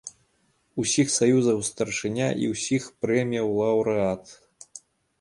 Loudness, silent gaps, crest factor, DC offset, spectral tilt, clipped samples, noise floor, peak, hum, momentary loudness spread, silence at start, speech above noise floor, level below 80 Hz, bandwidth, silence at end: -24 LUFS; none; 18 dB; under 0.1%; -4.5 dB/octave; under 0.1%; -68 dBFS; -8 dBFS; none; 16 LU; 0.05 s; 44 dB; -60 dBFS; 11.5 kHz; 0.4 s